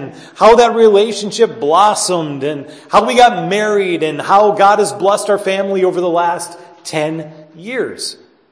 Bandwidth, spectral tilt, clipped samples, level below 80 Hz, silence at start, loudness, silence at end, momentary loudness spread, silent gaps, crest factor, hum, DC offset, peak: 11 kHz; -4 dB/octave; 0.1%; -50 dBFS; 0 s; -13 LUFS; 0.35 s; 15 LU; none; 14 dB; none; under 0.1%; 0 dBFS